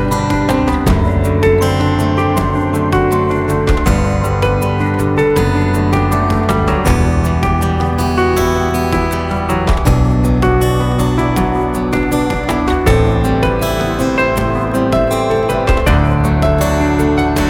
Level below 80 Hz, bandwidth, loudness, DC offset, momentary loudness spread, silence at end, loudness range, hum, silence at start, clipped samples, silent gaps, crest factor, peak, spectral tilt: -20 dBFS; 18 kHz; -14 LUFS; under 0.1%; 3 LU; 0 s; 1 LU; none; 0 s; under 0.1%; none; 12 dB; 0 dBFS; -6.5 dB/octave